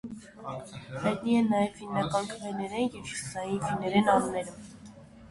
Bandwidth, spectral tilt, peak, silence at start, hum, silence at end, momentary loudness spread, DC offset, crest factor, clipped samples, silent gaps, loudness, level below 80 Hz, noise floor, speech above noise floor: 11.5 kHz; -5.5 dB/octave; -10 dBFS; 0.05 s; none; 0 s; 18 LU; under 0.1%; 20 dB; under 0.1%; none; -29 LUFS; -60 dBFS; -50 dBFS; 20 dB